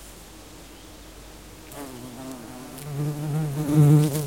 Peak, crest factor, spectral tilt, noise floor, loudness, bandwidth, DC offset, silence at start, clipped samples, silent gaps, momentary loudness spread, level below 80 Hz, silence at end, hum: -8 dBFS; 18 dB; -7 dB/octave; -44 dBFS; -22 LUFS; 17 kHz; 0.1%; 0 s; under 0.1%; none; 26 LU; -50 dBFS; 0 s; none